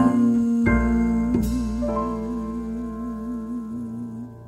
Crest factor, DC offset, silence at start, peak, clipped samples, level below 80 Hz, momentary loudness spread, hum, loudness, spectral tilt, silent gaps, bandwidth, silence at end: 16 dB; under 0.1%; 0 s; -6 dBFS; under 0.1%; -34 dBFS; 12 LU; 60 Hz at -45 dBFS; -24 LUFS; -8 dB/octave; none; 13.5 kHz; 0 s